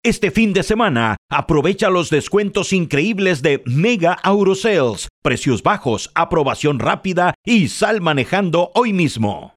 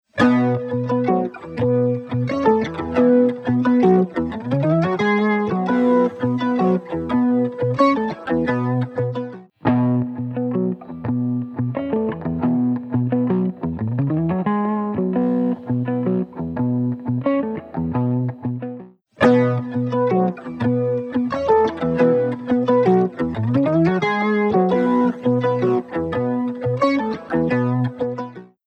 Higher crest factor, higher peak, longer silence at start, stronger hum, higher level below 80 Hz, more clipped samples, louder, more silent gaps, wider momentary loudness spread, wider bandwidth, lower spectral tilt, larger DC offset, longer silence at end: about the same, 16 dB vs 16 dB; about the same, 0 dBFS vs -2 dBFS; about the same, 0.05 s vs 0.15 s; neither; first, -42 dBFS vs -52 dBFS; neither; first, -17 LUFS vs -20 LUFS; first, 1.18-1.29 s, 5.10-5.22 s, 7.35-7.44 s vs none; second, 4 LU vs 8 LU; first, 13.5 kHz vs 6.6 kHz; second, -5.5 dB/octave vs -9 dB/octave; neither; about the same, 0.1 s vs 0.2 s